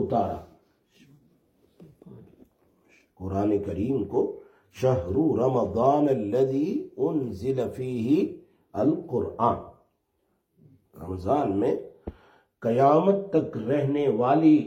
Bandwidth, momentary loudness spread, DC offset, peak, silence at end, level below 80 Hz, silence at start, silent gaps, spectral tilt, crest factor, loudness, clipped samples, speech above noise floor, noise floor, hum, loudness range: 8.4 kHz; 12 LU; under 0.1%; -8 dBFS; 0 s; -60 dBFS; 0 s; none; -9 dB/octave; 18 dB; -25 LUFS; under 0.1%; 49 dB; -73 dBFS; none; 7 LU